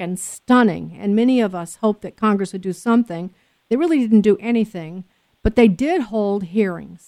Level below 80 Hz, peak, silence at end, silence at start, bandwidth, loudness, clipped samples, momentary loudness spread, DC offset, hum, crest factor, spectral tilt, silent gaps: -40 dBFS; -2 dBFS; 0.1 s; 0 s; 13.5 kHz; -19 LUFS; under 0.1%; 11 LU; under 0.1%; none; 18 dB; -6.5 dB/octave; none